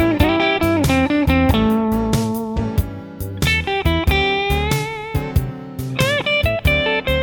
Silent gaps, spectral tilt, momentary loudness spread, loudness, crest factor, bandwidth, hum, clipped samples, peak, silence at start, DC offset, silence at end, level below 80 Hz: none; -5.5 dB/octave; 8 LU; -18 LUFS; 16 dB; over 20 kHz; none; under 0.1%; -2 dBFS; 0 s; under 0.1%; 0 s; -26 dBFS